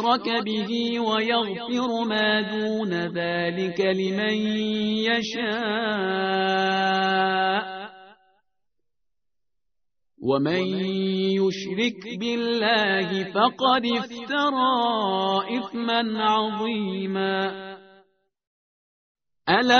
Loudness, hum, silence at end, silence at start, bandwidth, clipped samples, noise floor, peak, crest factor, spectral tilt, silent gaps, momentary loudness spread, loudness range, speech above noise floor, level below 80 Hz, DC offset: -24 LUFS; none; 0 s; 0 s; 6.6 kHz; under 0.1%; -85 dBFS; -2 dBFS; 22 dB; -2.5 dB/octave; 18.47-19.15 s; 6 LU; 6 LU; 61 dB; -66 dBFS; under 0.1%